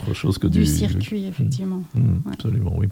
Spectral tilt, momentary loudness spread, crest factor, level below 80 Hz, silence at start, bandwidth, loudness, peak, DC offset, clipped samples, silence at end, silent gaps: -6.5 dB/octave; 6 LU; 16 dB; -34 dBFS; 0 s; 16.5 kHz; -22 LUFS; -6 dBFS; under 0.1%; under 0.1%; 0 s; none